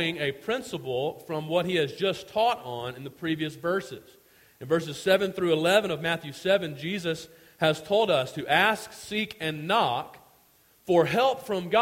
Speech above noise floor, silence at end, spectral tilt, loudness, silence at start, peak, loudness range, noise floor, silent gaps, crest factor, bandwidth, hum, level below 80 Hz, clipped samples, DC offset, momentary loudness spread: 35 dB; 0 s; -4.5 dB/octave; -27 LUFS; 0 s; -6 dBFS; 3 LU; -61 dBFS; none; 20 dB; 16.5 kHz; none; -64 dBFS; under 0.1%; under 0.1%; 12 LU